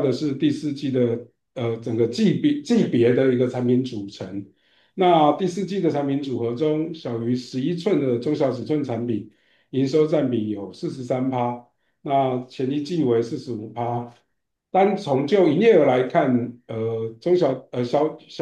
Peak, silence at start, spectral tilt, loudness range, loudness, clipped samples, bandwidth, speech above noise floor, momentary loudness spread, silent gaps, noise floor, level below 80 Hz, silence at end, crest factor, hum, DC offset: -6 dBFS; 0 s; -7.5 dB/octave; 5 LU; -22 LUFS; under 0.1%; 9.6 kHz; 45 dB; 12 LU; none; -66 dBFS; -70 dBFS; 0 s; 16 dB; none; under 0.1%